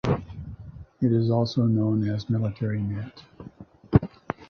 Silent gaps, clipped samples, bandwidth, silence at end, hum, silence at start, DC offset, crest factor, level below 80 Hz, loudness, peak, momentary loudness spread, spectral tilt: none; under 0.1%; 6.4 kHz; 0.05 s; none; 0.05 s; under 0.1%; 22 dB; -44 dBFS; -25 LUFS; -2 dBFS; 22 LU; -9 dB/octave